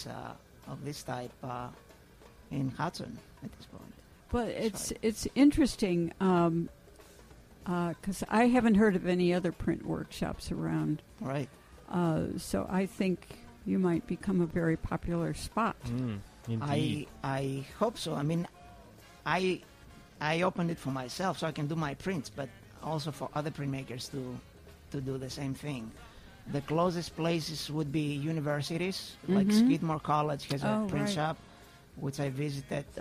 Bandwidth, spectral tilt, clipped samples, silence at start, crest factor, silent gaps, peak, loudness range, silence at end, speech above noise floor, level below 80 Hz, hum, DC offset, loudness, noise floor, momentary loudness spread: 15.5 kHz; -6 dB/octave; under 0.1%; 0 s; 20 dB; none; -14 dBFS; 9 LU; 0 s; 24 dB; -54 dBFS; none; under 0.1%; -32 LUFS; -56 dBFS; 15 LU